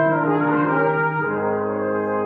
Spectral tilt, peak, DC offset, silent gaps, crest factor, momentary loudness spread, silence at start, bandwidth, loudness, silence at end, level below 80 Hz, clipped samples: -11.5 dB/octave; -8 dBFS; under 0.1%; none; 12 dB; 4 LU; 0 s; 4.4 kHz; -20 LUFS; 0 s; -64 dBFS; under 0.1%